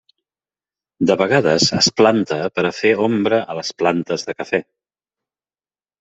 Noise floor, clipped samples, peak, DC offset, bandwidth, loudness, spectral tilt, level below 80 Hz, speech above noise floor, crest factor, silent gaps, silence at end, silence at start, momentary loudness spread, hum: under -90 dBFS; under 0.1%; -2 dBFS; under 0.1%; 8.4 kHz; -17 LUFS; -4 dB/octave; -60 dBFS; over 73 dB; 18 dB; none; 1.4 s; 1 s; 9 LU; none